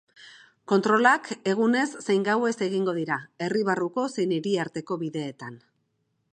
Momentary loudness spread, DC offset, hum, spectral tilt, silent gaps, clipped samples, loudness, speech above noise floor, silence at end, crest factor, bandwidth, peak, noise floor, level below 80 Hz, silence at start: 11 LU; under 0.1%; none; -5.5 dB/octave; none; under 0.1%; -25 LUFS; 49 dB; 0.75 s; 20 dB; 9.6 kHz; -6 dBFS; -74 dBFS; -76 dBFS; 0.25 s